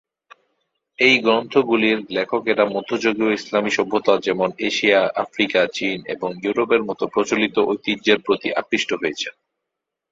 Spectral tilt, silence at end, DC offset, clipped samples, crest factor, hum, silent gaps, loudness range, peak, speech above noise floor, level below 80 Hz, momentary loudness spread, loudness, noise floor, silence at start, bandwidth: -4 dB/octave; 0.8 s; under 0.1%; under 0.1%; 20 dB; none; none; 2 LU; -2 dBFS; 63 dB; -62 dBFS; 7 LU; -19 LUFS; -82 dBFS; 1 s; 7.8 kHz